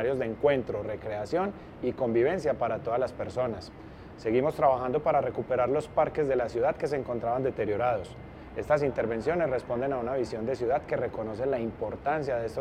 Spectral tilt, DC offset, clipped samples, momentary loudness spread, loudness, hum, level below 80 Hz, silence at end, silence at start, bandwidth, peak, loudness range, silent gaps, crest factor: -7.5 dB/octave; under 0.1%; under 0.1%; 8 LU; -29 LUFS; none; -52 dBFS; 0 s; 0 s; 12 kHz; -10 dBFS; 3 LU; none; 18 dB